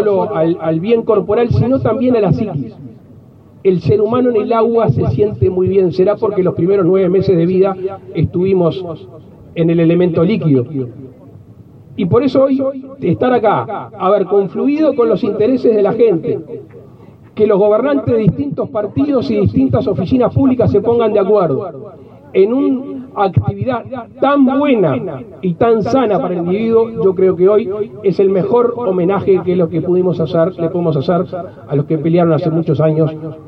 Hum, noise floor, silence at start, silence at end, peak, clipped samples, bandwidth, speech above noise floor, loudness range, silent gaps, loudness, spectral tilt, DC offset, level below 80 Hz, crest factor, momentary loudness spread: none; -40 dBFS; 0 s; 0 s; 0 dBFS; under 0.1%; 6 kHz; 27 dB; 2 LU; none; -14 LUFS; -10 dB/octave; under 0.1%; -44 dBFS; 12 dB; 9 LU